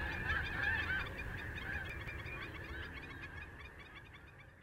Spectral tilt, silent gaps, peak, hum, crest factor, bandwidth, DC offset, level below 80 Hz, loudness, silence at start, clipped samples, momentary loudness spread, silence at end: -5 dB/octave; none; -24 dBFS; none; 18 dB; 16 kHz; under 0.1%; -52 dBFS; -41 LUFS; 0 s; under 0.1%; 17 LU; 0 s